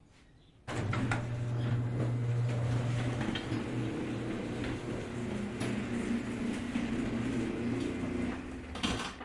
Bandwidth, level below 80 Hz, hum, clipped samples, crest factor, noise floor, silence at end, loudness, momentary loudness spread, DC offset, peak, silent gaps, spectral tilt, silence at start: 11.5 kHz; -52 dBFS; none; under 0.1%; 16 dB; -60 dBFS; 0 s; -35 LUFS; 5 LU; under 0.1%; -18 dBFS; none; -6.5 dB/octave; 0.65 s